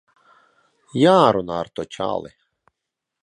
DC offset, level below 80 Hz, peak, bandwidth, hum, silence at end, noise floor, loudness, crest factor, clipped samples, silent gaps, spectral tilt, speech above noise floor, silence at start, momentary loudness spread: under 0.1%; -58 dBFS; 0 dBFS; 11 kHz; none; 0.95 s; -83 dBFS; -19 LUFS; 22 dB; under 0.1%; none; -6.5 dB/octave; 64 dB; 0.95 s; 16 LU